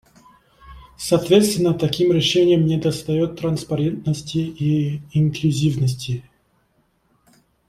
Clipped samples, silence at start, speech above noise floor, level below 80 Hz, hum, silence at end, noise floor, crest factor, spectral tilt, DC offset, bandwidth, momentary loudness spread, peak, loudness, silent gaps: under 0.1%; 0.65 s; 45 dB; -50 dBFS; none; 1.45 s; -64 dBFS; 18 dB; -6 dB/octave; under 0.1%; 15 kHz; 9 LU; -2 dBFS; -20 LUFS; none